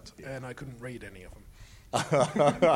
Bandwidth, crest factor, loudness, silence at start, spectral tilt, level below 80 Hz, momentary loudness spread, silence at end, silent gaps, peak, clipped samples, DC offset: 16 kHz; 20 dB; -28 LUFS; 0.05 s; -5.5 dB/octave; -54 dBFS; 22 LU; 0 s; none; -10 dBFS; under 0.1%; under 0.1%